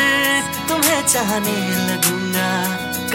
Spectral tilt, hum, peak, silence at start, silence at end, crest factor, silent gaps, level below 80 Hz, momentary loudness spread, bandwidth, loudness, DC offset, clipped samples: -2.5 dB/octave; none; -2 dBFS; 0 s; 0 s; 16 dB; none; -50 dBFS; 6 LU; 17 kHz; -17 LUFS; under 0.1%; under 0.1%